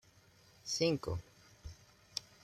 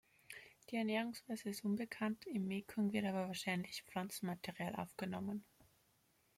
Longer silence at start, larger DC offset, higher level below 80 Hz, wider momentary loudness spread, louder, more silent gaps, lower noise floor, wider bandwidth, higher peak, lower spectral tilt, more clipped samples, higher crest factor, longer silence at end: first, 0.65 s vs 0.3 s; neither; first, -60 dBFS vs -80 dBFS; first, 21 LU vs 7 LU; first, -38 LUFS vs -43 LUFS; neither; second, -65 dBFS vs -76 dBFS; about the same, 15 kHz vs 16 kHz; first, -20 dBFS vs -26 dBFS; second, -4 dB/octave vs -5.5 dB/octave; neither; about the same, 22 dB vs 18 dB; second, 0.2 s vs 0.75 s